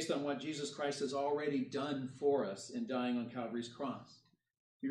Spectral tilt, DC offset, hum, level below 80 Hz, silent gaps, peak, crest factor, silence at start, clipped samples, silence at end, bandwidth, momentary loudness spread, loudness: -5 dB/octave; under 0.1%; none; -84 dBFS; 4.59-4.80 s; -22 dBFS; 16 dB; 0 s; under 0.1%; 0 s; 12 kHz; 8 LU; -39 LUFS